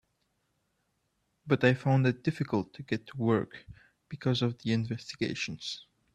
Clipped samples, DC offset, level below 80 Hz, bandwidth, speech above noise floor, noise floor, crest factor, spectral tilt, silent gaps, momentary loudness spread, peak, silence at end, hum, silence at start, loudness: under 0.1%; under 0.1%; -66 dBFS; 9.4 kHz; 47 dB; -77 dBFS; 22 dB; -6.5 dB/octave; none; 13 LU; -10 dBFS; 0.3 s; none; 1.45 s; -31 LUFS